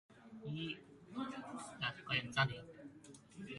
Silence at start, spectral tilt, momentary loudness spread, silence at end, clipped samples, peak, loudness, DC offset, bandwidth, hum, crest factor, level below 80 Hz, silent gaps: 0.1 s; -4.5 dB/octave; 19 LU; 0 s; under 0.1%; -20 dBFS; -42 LUFS; under 0.1%; 11.5 kHz; none; 24 dB; -72 dBFS; none